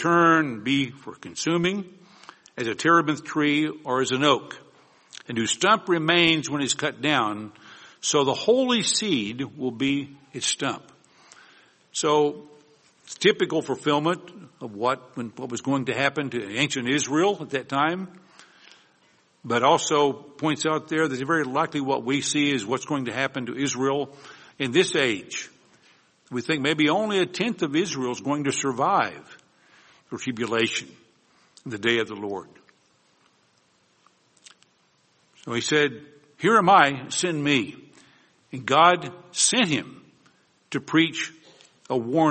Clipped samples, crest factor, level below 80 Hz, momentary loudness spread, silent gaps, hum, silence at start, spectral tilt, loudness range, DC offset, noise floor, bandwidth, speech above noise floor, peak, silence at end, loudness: under 0.1%; 22 dB; -68 dBFS; 15 LU; none; none; 0 s; -3.5 dB/octave; 6 LU; under 0.1%; -64 dBFS; 8.8 kHz; 41 dB; -2 dBFS; 0 s; -23 LUFS